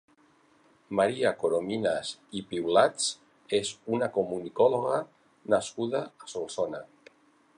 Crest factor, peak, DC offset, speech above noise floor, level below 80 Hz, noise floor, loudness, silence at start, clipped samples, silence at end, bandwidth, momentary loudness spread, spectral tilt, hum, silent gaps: 22 dB; -8 dBFS; under 0.1%; 35 dB; -70 dBFS; -63 dBFS; -29 LUFS; 0.9 s; under 0.1%; 0.7 s; 10.5 kHz; 13 LU; -4 dB/octave; none; none